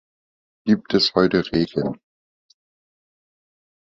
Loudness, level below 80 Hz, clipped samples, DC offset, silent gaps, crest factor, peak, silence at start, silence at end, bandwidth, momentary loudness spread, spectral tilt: -20 LUFS; -52 dBFS; under 0.1%; under 0.1%; none; 22 dB; -2 dBFS; 0.65 s; 2.05 s; 7.8 kHz; 12 LU; -6.5 dB/octave